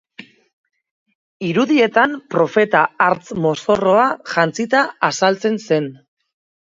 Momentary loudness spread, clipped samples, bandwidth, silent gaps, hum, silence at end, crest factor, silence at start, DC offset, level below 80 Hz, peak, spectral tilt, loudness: 6 LU; under 0.1%; 7.8 kHz; 0.53-0.64 s, 0.91-1.06 s, 1.15-1.40 s; none; 0.75 s; 18 dB; 0.2 s; under 0.1%; -60 dBFS; 0 dBFS; -5 dB/octave; -17 LUFS